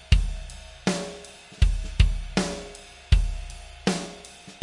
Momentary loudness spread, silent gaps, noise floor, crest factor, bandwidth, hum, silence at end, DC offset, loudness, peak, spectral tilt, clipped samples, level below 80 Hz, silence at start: 17 LU; none; -45 dBFS; 22 dB; 11.5 kHz; none; 0.05 s; under 0.1%; -27 LUFS; -4 dBFS; -5 dB/octave; under 0.1%; -28 dBFS; 0.1 s